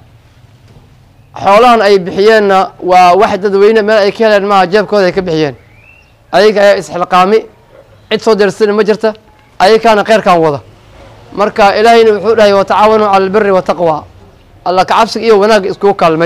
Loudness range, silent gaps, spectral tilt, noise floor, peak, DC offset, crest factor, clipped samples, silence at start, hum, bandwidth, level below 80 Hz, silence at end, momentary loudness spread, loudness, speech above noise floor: 3 LU; none; -5 dB/octave; -41 dBFS; 0 dBFS; under 0.1%; 8 dB; under 0.1%; 1.35 s; none; 14.5 kHz; -42 dBFS; 0 s; 8 LU; -8 LUFS; 34 dB